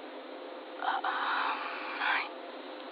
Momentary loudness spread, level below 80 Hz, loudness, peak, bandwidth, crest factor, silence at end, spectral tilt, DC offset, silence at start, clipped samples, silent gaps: 13 LU; under -90 dBFS; -34 LUFS; -18 dBFS; 5.6 kHz; 18 dB; 0 s; -2.5 dB/octave; under 0.1%; 0 s; under 0.1%; none